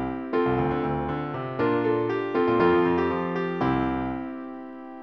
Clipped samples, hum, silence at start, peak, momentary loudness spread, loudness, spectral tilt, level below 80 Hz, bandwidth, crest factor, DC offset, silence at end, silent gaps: under 0.1%; none; 0 s; -8 dBFS; 13 LU; -25 LUFS; -9 dB/octave; -48 dBFS; 6 kHz; 16 dB; under 0.1%; 0 s; none